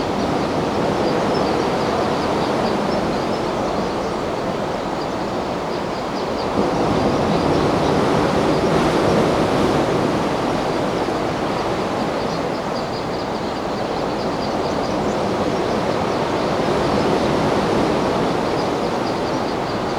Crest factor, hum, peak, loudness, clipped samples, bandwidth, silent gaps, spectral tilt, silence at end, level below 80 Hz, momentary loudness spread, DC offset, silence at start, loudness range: 18 dB; none; -2 dBFS; -20 LUFS; under 0.1%; over 20 kHz; none; -6 dB/octave; 0 s; -40 dBFS; 6 LU; under 0.1%; 0 s; 5 LU